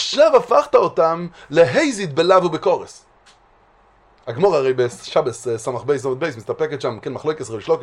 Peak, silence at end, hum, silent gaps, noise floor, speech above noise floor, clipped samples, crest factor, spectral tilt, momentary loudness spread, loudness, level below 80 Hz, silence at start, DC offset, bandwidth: 0 dBFS; 0 s; none; none; -54 dBFS; 36 dB; under 0.1%; 18 dB; -5 dB/octave; 11 LU; -18 LUFS; -58 dBFS; 0 s; under 0.1%; 11.5 kHz